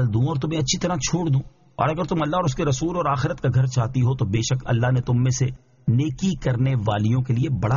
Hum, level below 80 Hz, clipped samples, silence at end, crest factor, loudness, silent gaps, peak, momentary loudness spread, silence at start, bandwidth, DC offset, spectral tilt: none; -44 dBFS; under 0.1%; 0 s; 14 dB; -22 LUFS; none; -6 dBFS; 3 LU; 0 s; 7.4 kHz; under 0.1%; -6.5 dB/octave